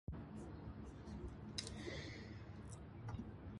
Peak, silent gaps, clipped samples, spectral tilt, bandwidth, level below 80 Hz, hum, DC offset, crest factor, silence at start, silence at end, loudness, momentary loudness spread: -28 dBFS; none; under 0.1%; -5 dB/octave; 11.5 kHz; -58 dBFS; none; under 0.1%; 24 dB; 0.1 s; 0 s; -51 LUFS; 6 LU